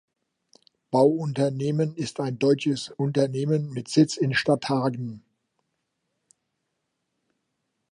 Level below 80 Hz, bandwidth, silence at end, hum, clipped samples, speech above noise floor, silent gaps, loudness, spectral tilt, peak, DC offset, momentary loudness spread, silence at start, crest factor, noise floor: -70 dBFS; 11 kHz; 2.75 s; none; under 0.1%; 55 dB; none; -24 LUFS; -6 dB/octave; -8 dBFS; under 0.1%; 7 LU; 0.9 s; 20 dB; -79 dBFS